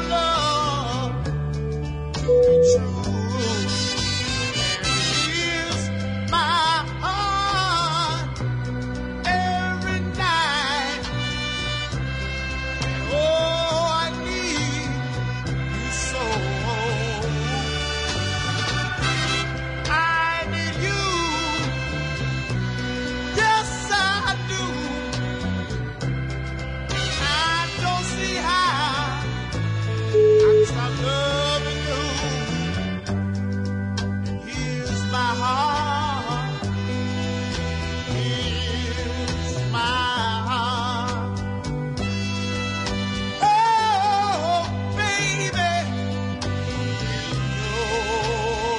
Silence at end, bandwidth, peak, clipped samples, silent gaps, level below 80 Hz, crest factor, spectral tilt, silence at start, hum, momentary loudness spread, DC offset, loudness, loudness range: 0 s; 11 kHz; -8 dBFS; under 0.1%; none; -38 dBFS; 16 dB; -4.5 dB/octave; 0 s; none; 7 LU; under 0.1%; -23 LUFS; 4 LU